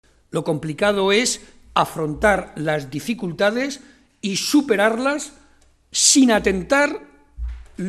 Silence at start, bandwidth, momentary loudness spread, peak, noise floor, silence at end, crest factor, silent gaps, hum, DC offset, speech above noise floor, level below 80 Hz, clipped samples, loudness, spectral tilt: 0.35 s; 14.5 kHz; 15 LU; -2 dBFS; -55 dBFS; 0 s; 18 dB; none; none; under 0.1%; 35 dB; -42 dBFS; under 0.1%; -19 LUFS; -3 dB/octave